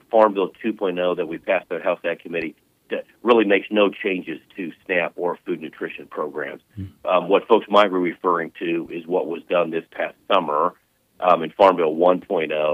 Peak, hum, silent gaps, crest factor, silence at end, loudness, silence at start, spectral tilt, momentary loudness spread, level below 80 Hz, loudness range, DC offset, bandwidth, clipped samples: -2 dBFS; none; none; 20 dB; 0 s; -21 LUFS; 0.15 s; -7 dB/octave; 14 LU; -66 dBFS; 4 LU; under 0.1%; 8 kHz; under 0.1%